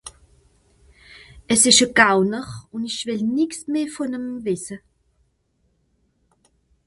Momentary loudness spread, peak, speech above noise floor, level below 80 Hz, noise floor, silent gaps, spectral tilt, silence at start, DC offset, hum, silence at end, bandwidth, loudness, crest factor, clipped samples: 19 LU; 0 dBFS; 47 dB; -56 dBFS; -67 dBFS; none; -2 dB/octave; 0.05 s; under 0.1%; none; 2.1 s; 12 kHz; -19 LUFS; 24 dB; under 0.1%